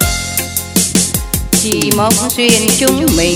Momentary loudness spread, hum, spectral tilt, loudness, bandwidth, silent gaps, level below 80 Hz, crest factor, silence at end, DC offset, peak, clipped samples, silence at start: 6 LU; none; -3 dB/octave; -12 LUFS; over 20 kHz; none; -28 dBFS; 12 dB; 0 s; under 0.1%; 0 dBFS; under 0.1%; 0 s